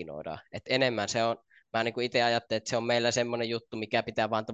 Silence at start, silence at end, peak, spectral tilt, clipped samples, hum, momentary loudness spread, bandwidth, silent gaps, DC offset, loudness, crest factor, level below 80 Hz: 0 s; 0 s; -12 dBFS; -4 dB/octave; under 0.1%; none; 12 LU; 8.8 kHz; none; under 0.1%; -29 LUFS; 18 dB; -66 dBFS